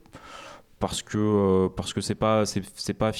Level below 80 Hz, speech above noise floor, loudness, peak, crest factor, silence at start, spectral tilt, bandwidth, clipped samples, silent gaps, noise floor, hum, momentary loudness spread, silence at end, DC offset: -50 dBFS; 21 dB; -26 LUFS; -10 dBFS; 16 dB; 0.15 s; -5.5 dB/octave; 14.5 kHz; under 0.1%; none; -45 dBFS; none; 21 LU; 0 s; under 0.1%